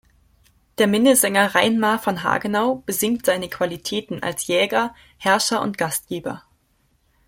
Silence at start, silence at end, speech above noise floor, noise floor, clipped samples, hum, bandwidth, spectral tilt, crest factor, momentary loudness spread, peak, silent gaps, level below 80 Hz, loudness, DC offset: 0.8 s; 0.9 s; 44 dB; -64 dBFS; under 0.1%; none; 16.5 kHz; -3 dB/octave; 20 dB; 12 LU; -2 dBFS; none; -58 dBFS; -20 LUFS; under 0.1%